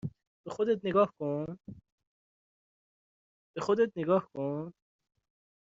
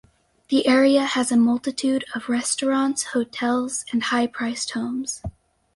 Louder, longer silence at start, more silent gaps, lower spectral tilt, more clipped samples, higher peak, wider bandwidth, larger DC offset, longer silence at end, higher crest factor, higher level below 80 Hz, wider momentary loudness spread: second, -31 LUFS vs -22 LUFS; second, 0.05 s vs 0.5 s; first, 0.27-0.44 s, 1.92-1.98 s, 2.07-3.54 s vs none; first, -6.5 dB/octave vs -3 dB/octave; neither; second, -14 dBFS vs -6 dBFS; second, 7.6 kHz vs 11.5 kHz; neither; first, 0.95 s vs 0.45 s; about the same, 20 dB vs 16 dB; second, -70 dBFS vs -52 dBFS; first, 18 LU vs 9 LU